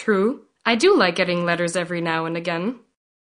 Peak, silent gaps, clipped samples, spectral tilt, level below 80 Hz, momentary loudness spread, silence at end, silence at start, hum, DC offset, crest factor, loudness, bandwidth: -2 dBFS; none; under 0.1%; -4.5 dB/octave; -68 dBFS; 10 LU; 0.55 s; 0 s; none; under 0.1%; 18 dB; -21 LUFS; 10.5 kHz